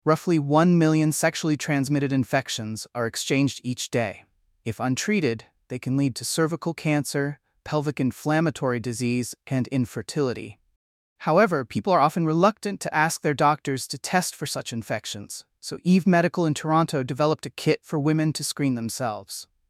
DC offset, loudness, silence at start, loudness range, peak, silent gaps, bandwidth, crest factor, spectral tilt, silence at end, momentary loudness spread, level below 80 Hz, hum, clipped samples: under 0.1%; -24 LUFS; 0.05 s; 4 LU; -6 dBFS; 10.76-11.16 s; 15.5 kHz; 18 dB; -5.5 dB/octave; 0.25 s; 11 LU; -64 dBFS; none; under 0.1%